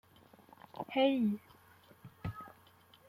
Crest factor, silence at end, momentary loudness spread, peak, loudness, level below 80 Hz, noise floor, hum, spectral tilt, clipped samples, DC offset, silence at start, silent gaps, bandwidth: 20 dB; 0.6 s; 24 LU; -18 dBFS; -35 LUFS; -68 dBFS; -63 dBFS; none; -7.5 dB/octave; under 0.1%; under 0.1%; 0.75 s; none; 16 kHz